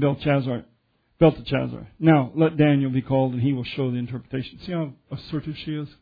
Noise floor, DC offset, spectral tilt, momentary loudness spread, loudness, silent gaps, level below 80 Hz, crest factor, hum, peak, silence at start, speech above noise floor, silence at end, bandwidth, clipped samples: -62 dBFS; under 0.1%; -10.5 dB/octave; 13 LU; -23 LUFS; none; -50 dBFS; 20 dB; none; -4 dBFS; 0 s; 40 dB; 0.15 s; 5 kHz; under 0.1%